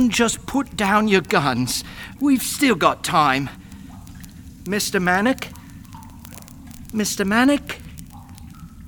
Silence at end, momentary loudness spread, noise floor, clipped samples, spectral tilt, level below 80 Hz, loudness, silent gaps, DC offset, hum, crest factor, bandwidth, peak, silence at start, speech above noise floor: 0 s; 23 LU; -39 dBFS; under 0.1%; -4 dB/octave; -44 dBFS; -19 LUFS; none; under 0.1%; none; 20 dB; over 20 kHz; -2 dBFS; 0 s; 20 dB